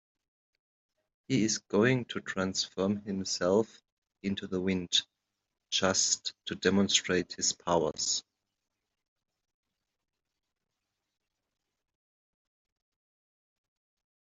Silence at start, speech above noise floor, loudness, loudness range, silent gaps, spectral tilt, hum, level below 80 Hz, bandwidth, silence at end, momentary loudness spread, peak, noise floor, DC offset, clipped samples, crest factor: 1.3 s; 56 dB; -30 LUFS; 6 LU; 3.92-4.02 s; -3 dB/octave; none; -70 dBFS; 8.2 kHz; 6 s; 8 LU; -10 dBFS; -86 dBFS; under 0.1%; under 0.1%; 24 dB